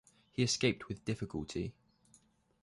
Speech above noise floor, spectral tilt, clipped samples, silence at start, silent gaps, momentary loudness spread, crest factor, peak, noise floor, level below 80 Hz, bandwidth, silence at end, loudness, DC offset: 33 dB; -4.5 dB/octave; under 0.1%; 0.4 s; none; 12 LU; 20 dB; -18 dBFS; -69 dBFS; -60 dBFS; 11.5 kHz; 0.9 s; -36 LUFS; under 0.1%